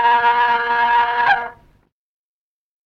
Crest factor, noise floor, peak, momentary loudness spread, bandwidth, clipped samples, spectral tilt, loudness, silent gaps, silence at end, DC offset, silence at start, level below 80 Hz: 14 dB; under -90 dBFS; -4 dBFS; 5 LU; 6.2 kHz; under 0.1%; -3 dB/octave; -16 LUFS; none; 1.35 s; under 0.1%; 0 s; -54 dBFS